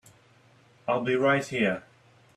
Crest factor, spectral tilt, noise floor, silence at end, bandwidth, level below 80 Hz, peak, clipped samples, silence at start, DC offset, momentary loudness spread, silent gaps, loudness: 18 dB; -5.5 dB/octave; -59 dBFS; 0.55 s; 13 kHz; -70 dBFS; -12 dBFS; under 0.1%; 0.85 s; under 0.1%; 12 LU; none; -26 LUFS